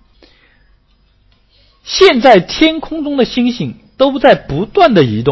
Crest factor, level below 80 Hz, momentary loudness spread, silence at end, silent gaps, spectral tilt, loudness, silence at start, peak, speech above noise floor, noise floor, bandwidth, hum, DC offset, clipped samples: 12 dB; -40 dBFS; 11 LU; 0 s; none; -5.5 dB/octave; -11 LUFS; 1.85 s; 0 dBFS; 42 dB; -53 dBFS; 8 kHz; none; under 0.1%; 0.4%